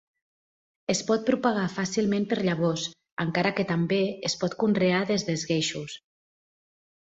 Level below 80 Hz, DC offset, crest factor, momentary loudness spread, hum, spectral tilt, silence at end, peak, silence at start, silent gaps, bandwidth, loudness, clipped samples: -64 dBFS; under 0.1%; 18 dB; 8 LU; none; -5 dB/octave; 1.05 s; -10 dBFS; 0.9 s; 3.12-3.17 s; 8 kHz; -26 LUFS; under 0.1%